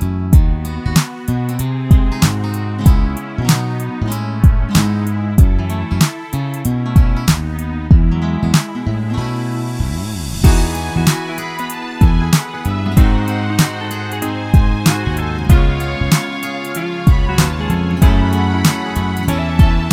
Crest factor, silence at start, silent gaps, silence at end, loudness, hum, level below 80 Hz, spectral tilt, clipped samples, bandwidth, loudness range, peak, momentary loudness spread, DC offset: 14 dB; 0 s; none; 0 s; -16 LUFS; none; -18 dBFS; -6 dB/octave; under 0.1%; 18 kHz; 2 LU; 0 dBFS; 8 LU; under 0.1%